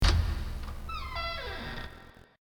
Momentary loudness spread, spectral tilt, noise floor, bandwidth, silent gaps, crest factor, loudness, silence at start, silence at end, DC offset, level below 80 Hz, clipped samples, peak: 15 LU; -4.5 dB/octave; -52 dBFS; 18.5 kHz; none; 22 dB; -35 LUFS; 0 s; 0.3 s; under 0.1%; -34 dBFS; under 0.1%; -10 dBFS